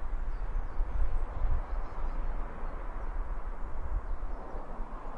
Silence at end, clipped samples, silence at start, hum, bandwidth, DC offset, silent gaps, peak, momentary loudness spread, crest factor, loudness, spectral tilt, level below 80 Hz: 0 s; under 0.1%; 0 s; none; 3 kHz; under 0.1%; none; -16 dBFS; 7 LU; 14 dB; -40 LUFS; -8.5 dB/octave; -32 dBFS